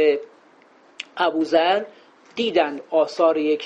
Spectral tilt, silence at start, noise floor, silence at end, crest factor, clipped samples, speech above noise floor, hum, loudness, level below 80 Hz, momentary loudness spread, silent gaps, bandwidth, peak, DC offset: -4.5 dB/octave; 0 s; -53 dBFS; 0 s; 16 dB; under 0.1%; 33 dB; none; -21 LUFS; -72 dBFS; 17 LU; none; 8.2 kHz; -6 dBFS; under 0.1%